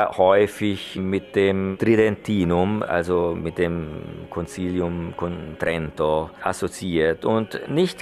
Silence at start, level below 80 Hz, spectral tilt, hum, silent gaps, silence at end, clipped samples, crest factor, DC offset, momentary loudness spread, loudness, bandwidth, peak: 0 s; -46 dBFS; -6.5 dB/octave; none; none; 0 s; under 0.1%; 18 dB; under 0.1%; 11 LU; -23 LUFS; 13.5 kHz; -4 dBFS